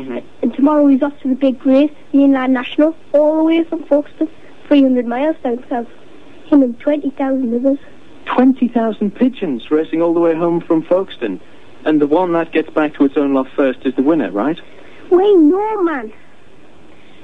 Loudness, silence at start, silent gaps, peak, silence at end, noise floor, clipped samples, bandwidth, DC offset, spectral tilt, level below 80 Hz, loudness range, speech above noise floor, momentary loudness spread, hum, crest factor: -15 LUFS; 0 s; none; 0 dBFS; 1.1 s; -45 dBFS; under 0.1%; 4.4 kHz; 2%; -8 dB/octave; -56 dBFS; 3 LU; 31 dB; 11 LU; none; 14 dB